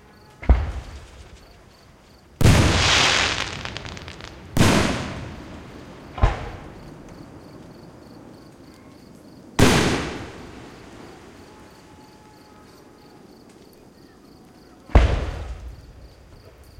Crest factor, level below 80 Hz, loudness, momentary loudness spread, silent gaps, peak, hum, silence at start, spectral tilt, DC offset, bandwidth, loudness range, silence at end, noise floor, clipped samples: 20 dB; -30 dBFS; -21 LUFS; 27 LU; none; -4 dBFS; none; 0.4 s; -4.5 dB/octave; under 0.1%; 16.5 kHz; 13 LU; 0.75 s; -50 dBFS; under 0.1%